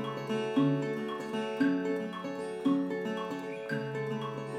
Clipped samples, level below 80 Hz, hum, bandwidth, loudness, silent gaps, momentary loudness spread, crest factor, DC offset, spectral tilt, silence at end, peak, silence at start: under 0.1%; -76 dBFS; none; 12 kHz; -33 LUFS; none; 8 LU; 16 dB; under 0.1%; -7 dB/octave; 0 s; -16 dBFS; 0 s